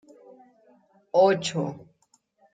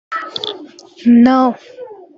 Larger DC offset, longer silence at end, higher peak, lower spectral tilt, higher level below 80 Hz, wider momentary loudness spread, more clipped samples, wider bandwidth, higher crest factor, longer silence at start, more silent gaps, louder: neither; first, 0.75 s vs 0.25 s; second, -8 dBFS vs 0 dBFS; about the same, -5 dB/octave vs -6 dB/octave; second, -72 dBFS vs -58 dBFS; second, 15 LU vs 24 LU; neither; first, 9.4 kHz vs 6.8 kHz; first, 20 dB vs 14 dB; first, 1.15 s vs 0.1 s; neither; second, -24 LUFS vs -13 LUFS